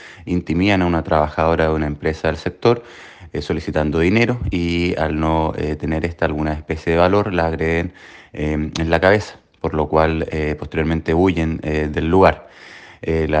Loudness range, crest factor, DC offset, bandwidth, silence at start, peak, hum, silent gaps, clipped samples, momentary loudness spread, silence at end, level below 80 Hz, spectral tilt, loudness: 1 LU; 18 dB; under 0.1%; 8.8 kHz; 0 s; 0 dBFS; none; none; under 0.1%; 11 LU; 0 s; -32 dBFS; -7 dB/octave; -19 LUFS